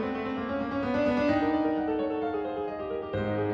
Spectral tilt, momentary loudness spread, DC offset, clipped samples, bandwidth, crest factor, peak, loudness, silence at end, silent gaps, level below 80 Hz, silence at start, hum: -8 dB/octave; 7 LU; under 0.1%; under 0.1%; 7 kHz; 14 dB; -14 dBFS; -29 LUFS; 0 s; none; -54 dBFS; 0 s; none